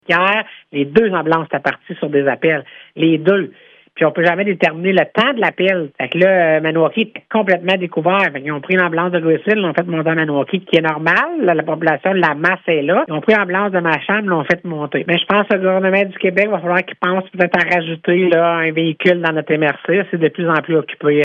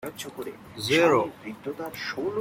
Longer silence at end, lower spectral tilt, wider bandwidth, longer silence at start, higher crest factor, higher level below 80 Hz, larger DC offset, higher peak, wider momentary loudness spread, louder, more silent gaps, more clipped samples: about the same, 0 s vs 0 s; first, -7.5 dB/octave vs -4.5 dB/octave; second, 7.4 kHz vs 16.5 kHz; about the same, 0.1 s vs 0 s; about the same, 16 dB vs 18 dB; about the same, -60 dBFS vs -64 dBFS; neither; first, 0 dBFS vs -10 dBFS; second, 5 LU vs 17 LU; first, -15 LUFS vs -26 LUFS; neither; neither